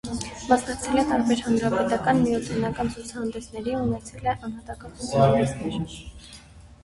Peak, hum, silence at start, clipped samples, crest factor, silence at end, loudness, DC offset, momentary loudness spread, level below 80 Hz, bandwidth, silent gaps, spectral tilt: -6 dBFS; none; 0.05 s; under 0.1%; 20 dB; 0.1 s; -25 LUFS; under 0.1%; 14 LU; -46 dBFS; 11.5 kHz; none; -6 dB/octave